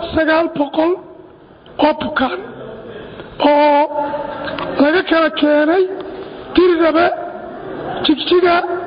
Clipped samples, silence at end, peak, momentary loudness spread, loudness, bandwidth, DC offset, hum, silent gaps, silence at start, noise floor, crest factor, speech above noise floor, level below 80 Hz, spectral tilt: under 0.1%; 0 s; 0 dBFS; 18 LU; -15 LUFS; 5.2 kHz; under 0.1%; none; none; 0 s; -41 dBFS; 16 dB; 27 dB; -46 dBFS; -10 dB/octave